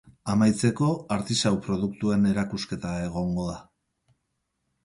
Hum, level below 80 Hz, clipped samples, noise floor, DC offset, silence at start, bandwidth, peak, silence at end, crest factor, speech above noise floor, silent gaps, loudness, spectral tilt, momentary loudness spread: none; -50 dBFS; under 0.1%; -78 dBFS; under 0.1%; 0.25 s; 11.5 kHz; -10 dBFS; 1.2 s; 18 dB; 53 dB; none; -26 LUFS; -5.5 dB/octave; 8 LU